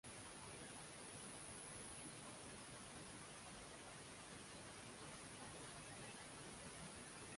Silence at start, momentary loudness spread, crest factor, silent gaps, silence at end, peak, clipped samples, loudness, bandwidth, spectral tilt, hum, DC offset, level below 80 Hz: 0.05 s; 3 LU; 14 dB; none; 0 s; -42 dBFS; under 0.1%; -55 LUFS; 11.5 kHz; -2.5 dB/octave; none; under 0.1%; -72 dBFS